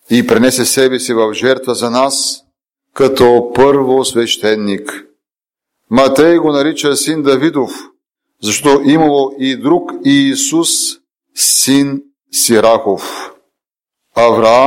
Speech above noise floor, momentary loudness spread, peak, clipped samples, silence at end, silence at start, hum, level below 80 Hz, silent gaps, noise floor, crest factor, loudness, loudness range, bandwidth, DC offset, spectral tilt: 74 dB; 12 LU; 0 dBFS; under 0.1%; 0 s; 0.1 s; none; -48 dBFS; none; -85 dBFS; 12 dB; -11 LUFS; 2 LU; 17 kHz; under 0.1%; -3.5 dB/octave